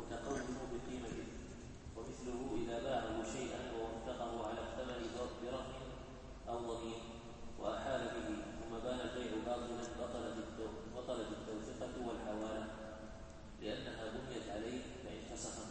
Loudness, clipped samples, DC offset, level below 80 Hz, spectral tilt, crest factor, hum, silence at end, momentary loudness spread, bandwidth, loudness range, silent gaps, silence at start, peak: -45 LUFS; under 0.1%; under 0.1%; -56 dBFS; -5 dB/octave; 18 dB; none; 0 s; 9 LU; 8.4 kHz; 3 LU; none; 0 s; -28 dBFS